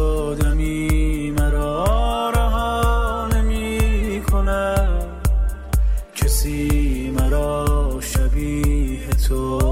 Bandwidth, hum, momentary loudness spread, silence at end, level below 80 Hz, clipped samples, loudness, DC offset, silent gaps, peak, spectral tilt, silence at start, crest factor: 16 kHz; none; 3 LU; 0 s; -20 dBFS; under 0.1%; -21 LUFS; under 0.1%; none; -8 dBFS; -6 dB/octave; 0 s; 10 dB